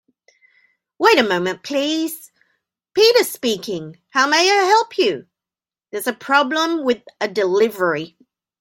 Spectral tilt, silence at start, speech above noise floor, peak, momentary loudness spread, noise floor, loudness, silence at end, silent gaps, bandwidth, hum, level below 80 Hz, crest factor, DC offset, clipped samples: -3 dB/octave; 1 s; over 72 dB; 0 dBFS; 13 LU; under -90 dBFS; -18 LUFS; 0.55 s; none; 17 kHz; none; -68 dBFS; 20 dB; under 0.1%; under 0.1%